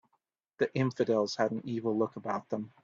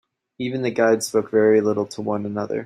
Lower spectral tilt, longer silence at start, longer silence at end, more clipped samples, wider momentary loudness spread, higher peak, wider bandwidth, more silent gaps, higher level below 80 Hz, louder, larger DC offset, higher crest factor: about the same, -6.5 dB/octave vs -5.5 dB/octave; first, 0.6 s vs 0.4 s; first, 0.15 s vs 0 s; neither; about the same, 7 LU vs 9 LU; second, -14 dBFS vs -4 dBFS; second, 7.6 kHz vs 14.5 kHz; neither; second, -74 dBFS vs -66 dBFS; second, -32 LUFS vs -21 LUFS; neither; about the same, 18 dB vs 16 dB